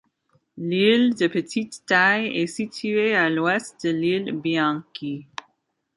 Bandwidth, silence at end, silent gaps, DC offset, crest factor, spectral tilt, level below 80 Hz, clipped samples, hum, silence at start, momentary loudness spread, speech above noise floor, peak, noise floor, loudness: 11.5 kHz; 0.75 s; none; under 0.1%; 18 dB; -5 dB/octave; -70 dBFS; under 0.1%; none; 0.55 s; 14 LU; 50 dB; -4 dBFS; -72 dBFS; -22 LUFS